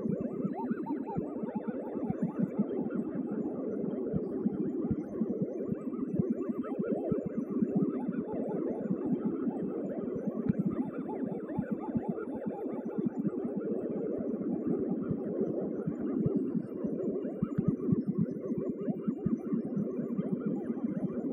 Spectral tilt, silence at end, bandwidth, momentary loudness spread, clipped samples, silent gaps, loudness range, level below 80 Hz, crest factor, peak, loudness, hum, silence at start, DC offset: -12 dB/octave; 0 s; 3.3 kHz; 4 LU; under 0.1%; none; 2 LU; -64 dBFS; 18 dB; -16 dBFS; -34 LUFS; none; 0 s; under 0.1%